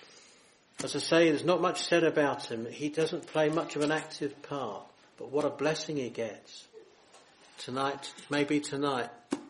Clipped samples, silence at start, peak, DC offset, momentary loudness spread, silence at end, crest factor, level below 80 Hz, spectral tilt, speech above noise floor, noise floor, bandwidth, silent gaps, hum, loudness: under 0.1%; 0.15 s; -12 dBFS; under 0.1%; 14 LU; 0 s; 20 dB; -74 dBFS; -4.5 dB/octave; 30 dB; -61 dBFS; 11.5 kHz; none; none; -31 LUFS